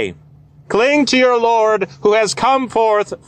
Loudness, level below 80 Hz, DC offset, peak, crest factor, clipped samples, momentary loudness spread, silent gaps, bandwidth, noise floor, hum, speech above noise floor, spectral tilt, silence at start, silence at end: -14 LUFS; -52 dBFS; under 0.1%; -4 dBFS; 12 dB; under 0.1%; 4 LU; none; 10 kHz; -44 dBFS; none; 30 dB; -3.5 dB/octave; 0 s; 0.1 s